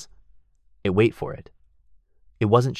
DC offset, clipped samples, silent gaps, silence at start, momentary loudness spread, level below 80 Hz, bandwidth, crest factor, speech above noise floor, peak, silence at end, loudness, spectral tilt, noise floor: under 0.1%; under 0.1%; none; 0 s; 19 LU; -50 dBFS; 13 kHz; 20 dB; 37 dB; -4 dBFS; 0 s; -23 LUFS; -7.5 dB/octave; -58 dBFS